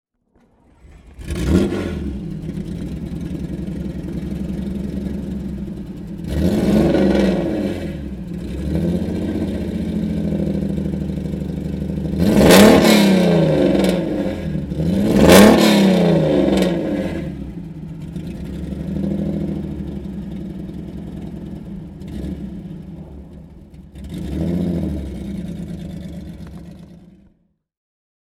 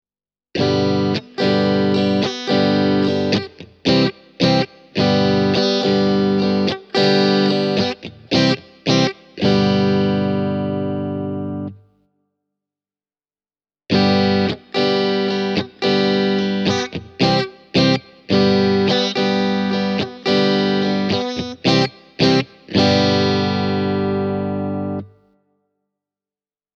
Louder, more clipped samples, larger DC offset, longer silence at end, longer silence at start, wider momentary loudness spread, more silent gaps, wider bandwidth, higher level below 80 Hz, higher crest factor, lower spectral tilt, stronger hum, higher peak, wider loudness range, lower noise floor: about the same, -18 LUFS vs -18 LUFS; neither; neither; second, 1.2 s vs 1.7 s; first, 1.05 s vs 0.55 s; first, 19 LU vs 7 LU; neither; first, 17 kHz vs 7.6 kHz; first, -32 dBFS vs -54 dBFS; about the same, 18 dB vs 16 dB; about the same, -6 dB/octave vs -6 dB/octave; second, none vs 50 Hz at -50 dBFS; about the same, 0 dBFS vs -2 dBFS; first, 16 LU vs 5 LU; second, -61 dBFS vs under -90 dBFS